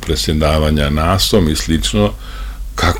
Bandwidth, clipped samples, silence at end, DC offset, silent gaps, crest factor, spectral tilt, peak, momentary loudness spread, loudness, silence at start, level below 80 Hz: 17 kHz; under 0.1%; 0 s; under 0.1%; none; 14 dB; -5 dB/octave; -2 dBFS; 15 LU; -14 LUFS; 0 s; -22 dBFS